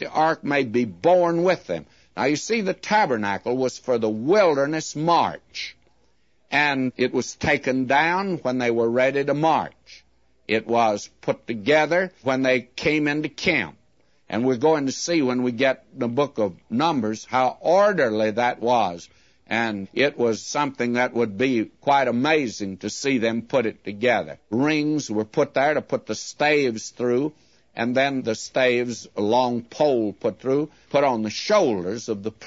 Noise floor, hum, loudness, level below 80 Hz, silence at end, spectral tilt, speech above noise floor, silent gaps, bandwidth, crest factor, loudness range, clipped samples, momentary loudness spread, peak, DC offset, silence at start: -66 dBFS; none; -22 LUFS; -60 dBFS; 0 s; -5 dB/octave; 44 dB; none; 8 kHz; 16 dB; 2 LU; under 0.1%; 8 LU; -6 dBFS; under 0.1%; 0 s